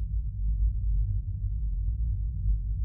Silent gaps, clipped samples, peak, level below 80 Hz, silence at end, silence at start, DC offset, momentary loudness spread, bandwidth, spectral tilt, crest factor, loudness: none; under 0.1%; -18 dBFS; -28 dBFS; 0 s; 0 s; under 0.1%; 3 LU; 0.5 kHz; -14 dB/octave; 10 dB; -32 LUFS